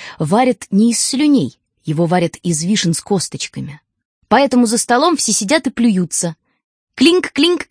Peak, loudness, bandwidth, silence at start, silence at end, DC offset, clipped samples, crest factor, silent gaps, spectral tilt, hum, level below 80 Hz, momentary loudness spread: 0 dBFS; -15 LUFS; 11 kHz; 0 s; 0.1 s; under 0.1%; under 0.1%; 16 dB; 4.05-4.21 s, 6.64-6.87 s; -4 dB/octave; none; -56 dBFS; 11 LU